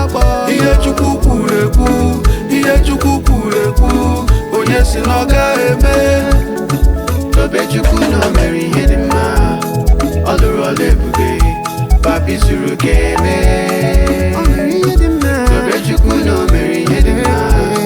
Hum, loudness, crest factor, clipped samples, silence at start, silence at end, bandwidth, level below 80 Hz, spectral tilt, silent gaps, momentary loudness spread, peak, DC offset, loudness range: none; -12 LUFS; 10 dB; under 0.1%; 0 s; 0 s; 20 kHz; -14 dBFS; -6 dB/octave; none; 3 LU; 0 dBFS; under 0.1%; 1 LU